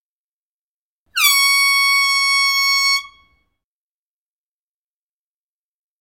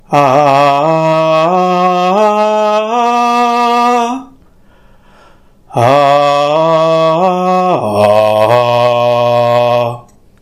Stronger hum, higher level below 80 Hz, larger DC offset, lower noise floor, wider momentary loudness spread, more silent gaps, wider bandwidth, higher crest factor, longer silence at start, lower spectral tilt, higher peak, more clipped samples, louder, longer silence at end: neither; second, -68 dBFS vs -50 dBFS; neither; first, under -90 dBFS vs -43 dBFS; about the same, 5 LU vs 4 LU; neither; first, 17 kHz vs 14 kHz; first, 20 dB vs 10 dB; first, 1.15 s vs 0.1 s; second, 6.5 dB/octave vs -6 dB/octave; about the same, 0 dBFS vs 0 dBFS; second, under 0.1% vs 0.2%; second, -13 LUFS vs -10 LUFS; first, 2.95 s vs 0.4 s